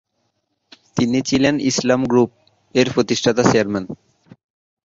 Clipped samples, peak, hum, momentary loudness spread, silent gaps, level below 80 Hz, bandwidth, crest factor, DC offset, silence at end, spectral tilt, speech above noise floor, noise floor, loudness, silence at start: under 0.1%; 0 dBFS; none; 10 LU; none; -52 dBFS; 7.8 kHz; 18 dB; under 0.1%; 0.9 s; -5 dB/octave; 53 dB; -70 dBFS; -18 LUFS; 0.95 s